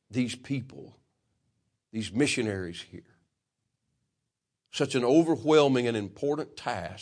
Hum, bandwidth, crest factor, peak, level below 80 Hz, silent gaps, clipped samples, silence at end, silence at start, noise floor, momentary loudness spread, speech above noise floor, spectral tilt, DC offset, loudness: none; 10.5 kHz; 20 dB; -8 dBFS; -68 dBFS; none; under 0.1%; 0 s; 0.1 s; -85 dBFS; 17 LU; 57 dB; -5.5 dB/octave; under 0.1%; -27 LUFS